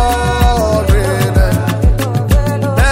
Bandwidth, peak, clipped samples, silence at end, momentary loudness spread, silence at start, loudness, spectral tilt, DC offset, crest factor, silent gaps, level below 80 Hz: 16.5 kHz; 0 dBFS; under 0.1%; 0 s; 2 LU; 0 s; -13 LUFS; -6 dB/octave; under 0.1%; 10 dB; none; -16 dBFS